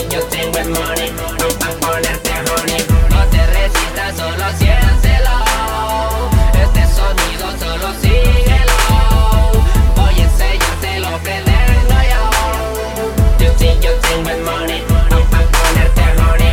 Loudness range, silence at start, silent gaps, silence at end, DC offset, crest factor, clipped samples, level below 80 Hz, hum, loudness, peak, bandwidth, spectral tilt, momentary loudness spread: 2 LU; 0 s; none; 0 s; under 0.1%; 12 dB; under 0.1%; -12 dBFS; none; -14 LUFS; 0 dBFS; 17.5 kHz; -4.5 dB/octave; 6 LU